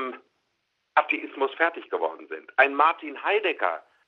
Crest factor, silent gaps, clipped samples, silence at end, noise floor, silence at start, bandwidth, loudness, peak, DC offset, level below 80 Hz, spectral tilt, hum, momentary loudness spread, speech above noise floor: 22 dB; none; under 0.1%; 0.25 s; -76 dBFS; 0 s; 6 kHz; -25 LUFS; -4 dBFS; under 0.1%; under -90 dBFS; -3.5 dB/octave; none; 9 LU; 51 dB